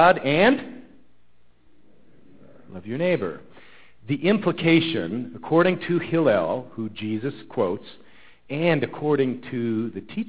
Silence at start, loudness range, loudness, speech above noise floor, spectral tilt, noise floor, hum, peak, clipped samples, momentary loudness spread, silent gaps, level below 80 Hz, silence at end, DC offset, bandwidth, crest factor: 0 s; 8 LU; -23 LUFS; 41 dB; -10.5 dB/octave; -63 dBFS; none; -4 dBFS; under 0.1%; 14 LU; none; -58 dBFS; 0 s; 0.5%; 4 kHz; 20 dB